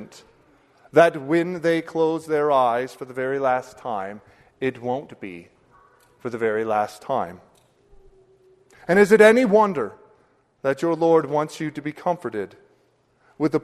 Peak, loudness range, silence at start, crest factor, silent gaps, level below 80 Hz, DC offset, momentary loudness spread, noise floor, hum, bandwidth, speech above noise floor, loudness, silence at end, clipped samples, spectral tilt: -2 dBFS; 10 LU; 0 s; 20 dB; none; -64 dBFS; under 0.1%; 16 LU; -63 dBFS; none; 13.5 kHz; 42 dB; -21 LUFS; 0.05 s; under 0.1%; -6 dB/octave